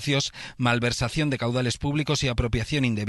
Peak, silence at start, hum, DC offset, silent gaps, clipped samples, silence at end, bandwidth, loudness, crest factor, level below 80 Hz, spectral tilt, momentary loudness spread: -8 dBFS; 0 s; none; under 0.1%; none; under 0.1%; 0 s; 12.5 kHz; -25 LUFS; 18 dB; -40 dBFS; -5 dB/octave; 3 LU